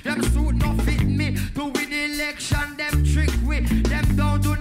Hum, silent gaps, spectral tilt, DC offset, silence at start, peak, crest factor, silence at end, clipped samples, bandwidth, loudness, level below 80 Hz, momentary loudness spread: none; none; -5.5 dB/octave; under 0.1%; 0.05 s; -8 dBFS; 14 dB; 0 s; under 0.1%; 16 kHz; -22 LUFS; -24 dBFS; 4 LU